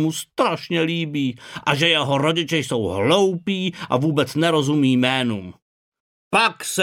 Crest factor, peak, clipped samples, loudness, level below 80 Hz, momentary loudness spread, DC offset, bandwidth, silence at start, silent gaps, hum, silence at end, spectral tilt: 18 dB; -2 dBFS; under 0.1%; -20 LUFS; -60 dBFS; 7 LU; under 0.1%; 17 kHz; 0 s; 5.62-5.92 s, 6.00-6.31 s; none; 0 s; -4.5 dB/octave